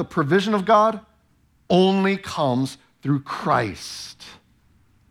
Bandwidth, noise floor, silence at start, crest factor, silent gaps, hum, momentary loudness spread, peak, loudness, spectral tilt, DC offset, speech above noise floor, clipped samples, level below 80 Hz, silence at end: 14 kHz; -61 dBFS; 0 s; 18 dB; none; none; 16 LU; -4 dBFS; -21 LUFS; -6 dB/octave; under 0.1%; 40 dB; under 0.1%; -58 dBFS; 0.75 s